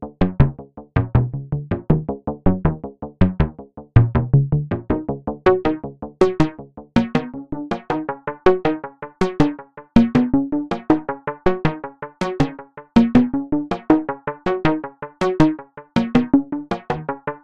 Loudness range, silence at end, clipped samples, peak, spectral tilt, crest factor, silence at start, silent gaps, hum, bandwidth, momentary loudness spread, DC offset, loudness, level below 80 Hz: 2 LU; 0.05 s; under 0.1%; 0 dBFS; -8.5 dB/octave; 20 dB; 0 s; none; none; 9 kHz; 11 LU; under 0.1%; -20 LUFS; -34 dBFS